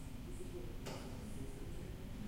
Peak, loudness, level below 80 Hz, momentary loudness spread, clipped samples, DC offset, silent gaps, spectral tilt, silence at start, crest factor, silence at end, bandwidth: -34 dBFS; -49 LUFS; -50 dBFS; 2 LU; under 0.1%; under 0.1%; none; -5.5 dB/octave; 0 s; 12 dB; 0 s; 16 kHz